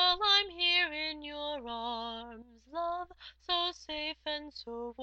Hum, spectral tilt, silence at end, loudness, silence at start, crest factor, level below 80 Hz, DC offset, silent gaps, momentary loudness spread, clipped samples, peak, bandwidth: none; -1.5 dB/octave; 0 s; -32 LUFS; 0 s; 20 dB; -62 dBFS; under 0.1%; none; 18 LU; under 0.1%; -14 dBFS; 8 kHz